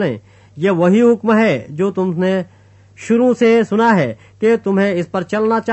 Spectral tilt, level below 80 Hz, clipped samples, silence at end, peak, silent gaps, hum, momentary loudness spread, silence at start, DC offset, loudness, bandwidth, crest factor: -7 dB/octave; -60 dBFS; under 0.1%; 0 s; -2 dBFS; none; none; 9 LU; 0 s; under 0.1%; -15 LUFS; 8.4 kHz; 14 dB